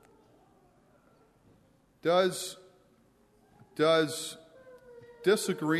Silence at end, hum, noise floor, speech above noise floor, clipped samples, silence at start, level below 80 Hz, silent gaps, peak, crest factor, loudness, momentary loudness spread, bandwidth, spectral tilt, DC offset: 0 s; none; -65 dBFS; 37 dB; under 0.1%; 2.05 s; -76 dBFS; none; -14 dBFS; 18 dB; -29 LUFS; 24 LU; 13.5 kHz; -4 dB/octave; under 0.1%